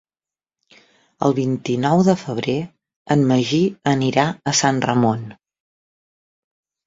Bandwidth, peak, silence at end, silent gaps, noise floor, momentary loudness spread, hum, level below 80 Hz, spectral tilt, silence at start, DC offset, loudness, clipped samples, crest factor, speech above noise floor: 7.8 kHz; -2 dBFS; 1.55 s; 2.96-3.05 s; under -90 dBFS; 7 LU; none; -58 dBFS; -5.5 dB/octave; 1.2 s; under 0.1%; -19 LUFS; under 0.1%; 18 dB; over 72 dB